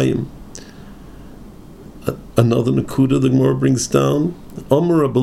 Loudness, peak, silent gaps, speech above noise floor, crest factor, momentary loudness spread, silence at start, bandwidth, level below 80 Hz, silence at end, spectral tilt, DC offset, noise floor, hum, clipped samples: -17 LUFS; 0 dBFS; none; 22 dB; 18 dB; 17 LU; 0 s; 14 kHz; -42 dBFS; 0 s; -7 dB/octave; under 0.1%; -38 dBFS; none; under 0.1%